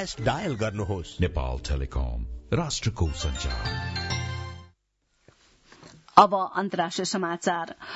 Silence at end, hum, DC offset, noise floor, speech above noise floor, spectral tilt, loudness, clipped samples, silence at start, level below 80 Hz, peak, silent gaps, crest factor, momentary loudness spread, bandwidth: 0 s; none; under 0.1%; -72 dBFS; 45 dB; -5 dB/octave; -27 LUFS; under 0.1%; 0 s; -38 dBFS; 0 dBFS; none; 28 dB; 11 LU; 8 kHz